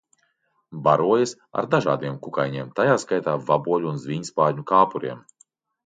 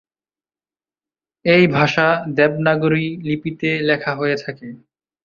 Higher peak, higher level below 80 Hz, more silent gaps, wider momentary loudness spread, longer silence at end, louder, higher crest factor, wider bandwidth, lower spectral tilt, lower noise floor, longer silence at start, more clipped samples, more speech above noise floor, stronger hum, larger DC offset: about the same, -4 dBFS vs -2 dBFS; second, -68 dBFS vs -56 dBFS; neither; about the same, 10 LU vs 11 LU; first, 0.65 s vs 0.5 s; second, -22 LUFS vs -17 LUFS; about the same, 20 dB vs 18 dB; first, 9.4 kHz vs 7 kHz; about the same, -6 dB/octave vs -7 dB/octave; second, -69 dBFS vs under -90 dBFS; second, 0.7 s vs 1.45 s; neither; second, 47 dB vs over 73 dB; neither; neither